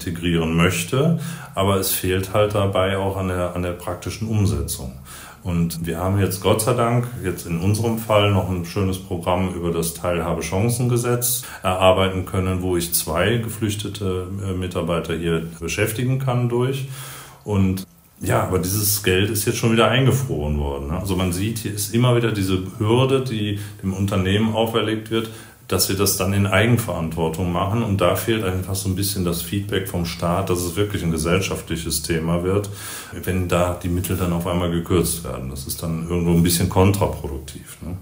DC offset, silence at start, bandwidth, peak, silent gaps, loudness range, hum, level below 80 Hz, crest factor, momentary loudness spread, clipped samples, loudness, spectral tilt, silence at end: under 0.1%; 0 s; 16.5 kHz; 0 dBFS; none; 3 LU; none; -42 dBFS; 20 dB; 9 LU; under 0.1%; -21 LUFS; -5 dB/octave; 0 s